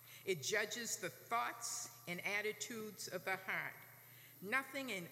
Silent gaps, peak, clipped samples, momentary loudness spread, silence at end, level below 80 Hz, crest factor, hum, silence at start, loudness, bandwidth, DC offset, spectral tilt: none; -24 dBFS; under 0.1%; 12 LU; 0 s; under -90 dBFS; 20 dB; none; 0 s; -42 LUFS; 16 kHz; under 0.1%; -2 dB/octave